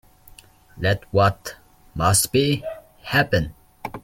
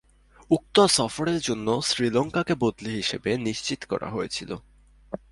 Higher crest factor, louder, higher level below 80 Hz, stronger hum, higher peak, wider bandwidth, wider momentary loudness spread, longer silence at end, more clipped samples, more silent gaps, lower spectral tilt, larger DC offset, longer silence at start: about the same, 20 dB vs 20 dB; first, -21 LUFS vs -25 LUFS; first, -44 dBFS vs -54 dBFS; neither; about the same, -4 dBFS vs -6 dBFS; first, 16.5 kHz vs 11.5 kHz; first, 19 LU vs 12 LU; about the same, 0.05 s vs 0.15 s; neither; neither; about the same, -4 dB/octave vs -4 dB/octave; neither; first, 0.75 s vs 0.5 s